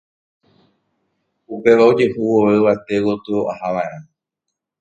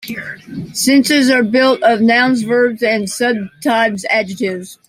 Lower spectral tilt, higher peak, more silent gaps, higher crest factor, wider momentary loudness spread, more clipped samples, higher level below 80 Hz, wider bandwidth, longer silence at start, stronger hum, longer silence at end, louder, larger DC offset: first, -7.5 dB/octave vs -3.5 dB/octave; about the same, 0 dBFS vs -2 dBFS; neither; first, 18 dB vs 12 dB; about the same, 11 LU vs 12 LU; neither; about the same, -58 dBFS vs -58 dBFS; second, 8.6 kHz vs 16 kHz; first, 1.5 s vs 0 s; neither; first, 0.8 s vs 0.15 s; second, -16 LUFS vs -13 LUFS; neither